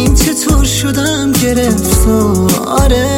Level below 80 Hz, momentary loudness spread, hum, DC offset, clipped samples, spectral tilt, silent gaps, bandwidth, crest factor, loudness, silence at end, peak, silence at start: -16 dBFS; 2 LU; none; under 0.1%; under 0.1%; -4.5 dB/octave; none; 17 kHz; 10 dB; -11 LUFS; 0 s; 0 dBFS; 0 s